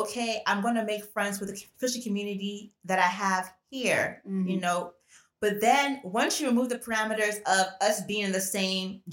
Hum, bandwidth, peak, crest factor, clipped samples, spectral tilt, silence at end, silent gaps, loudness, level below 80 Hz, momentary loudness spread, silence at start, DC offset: none; 17 kHz; -8 dBFS; 20 dB; under 0.1%; -3.5 dB/octave; 0 s; none; -28 LUFS; -72 dBFS; 8 LU; 0 s; under 0.1%